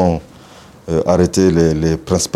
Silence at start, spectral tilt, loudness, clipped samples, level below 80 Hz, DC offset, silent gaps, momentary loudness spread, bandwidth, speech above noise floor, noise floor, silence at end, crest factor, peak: 0 s; -6 dB/octave; -15 LUFS; under 0.1%; -38 dBFS; under 0.1%; none; 10 LU; 14 kHz; 27 dB; -40 dBFS; 0.05 s; 14 dB; 0 dBFS